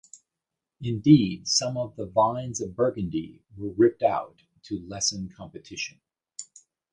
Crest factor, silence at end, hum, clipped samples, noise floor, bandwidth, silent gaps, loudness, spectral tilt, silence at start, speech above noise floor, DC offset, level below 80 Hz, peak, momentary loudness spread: 22 dB; 0.5 s; none; under 0.1%; -87 dBFS; 10 kHz; none; -25 LUFS; -5 dB/octave; 0.8 s; 62 dB; under 0.1%; -56 dBFS; -4 dBFS; 22 LU